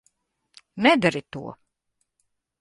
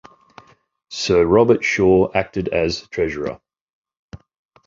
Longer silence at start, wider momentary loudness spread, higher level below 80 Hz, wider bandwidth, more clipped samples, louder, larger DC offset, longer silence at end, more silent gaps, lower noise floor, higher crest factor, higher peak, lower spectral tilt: second, 0.75 s vs 0.9 s; first, 22 LU vs 14 LU; second, -62 dBFS vs -44 dBFS; first, 11.5 kHz vs 7.6 kHz; neither; second, -21 LUFS vs -18 LUFS; neither; first, 1.05 s vs 0.5 s; second, none vs 3.61-3.66 s, 3.73-3.82 s, 3.99-4.09 s; first, -76 dBFS vs -48 dBFS; first, 24 dB vs 18 dB; about the same, -4 dBFS vs -2 dBFS; about the same, -5.5 dB/octave vs -5.5 dB/octave